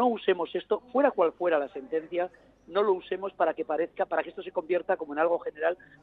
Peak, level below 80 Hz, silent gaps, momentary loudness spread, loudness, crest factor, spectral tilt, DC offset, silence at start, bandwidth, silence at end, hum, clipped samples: -10 dBFS; -70 dBFS; none; 8 LU; -29 LUFS; 18 dB; -7.5 dB/octave; under 0.1%; 0 s; 4.6 kHz; 0.3 s; none; under 0.1%